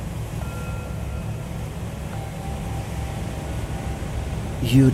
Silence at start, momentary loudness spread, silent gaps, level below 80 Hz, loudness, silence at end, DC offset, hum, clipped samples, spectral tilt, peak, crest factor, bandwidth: 0 s; 4 LU; none; -34 dBFS; -28 LUFS; 0 s; under 0.1%; none; under 0.1%; -6.5 dB/octave; -4 dBFS; 20 dB; 15.5 kHz